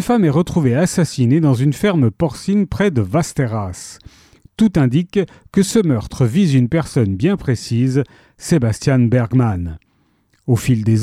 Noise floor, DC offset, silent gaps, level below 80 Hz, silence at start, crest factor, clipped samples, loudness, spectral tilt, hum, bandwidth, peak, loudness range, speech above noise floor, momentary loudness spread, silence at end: -59 dBFS; under 0.1%; none; -42 dBFS; 0 s; 12 dB; under 0.1%; -16 LUFS; -7 dB/octave; none; 14.5 kHz; -4 dBFS; 2 LU; 44 dB; 7 LU; 0 s